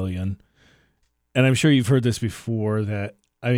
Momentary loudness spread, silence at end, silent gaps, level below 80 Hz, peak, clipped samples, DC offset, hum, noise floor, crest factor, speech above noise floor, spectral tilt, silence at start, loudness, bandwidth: 13 LU; 0 s; none; -54 dBFS; -4 dBFS; under 0.1%; under 0.1%; none; -68 dBFS; 18 dB; 47 dB; -6 dB/octave; 0 s; -22 LUFS; 15.5 kHz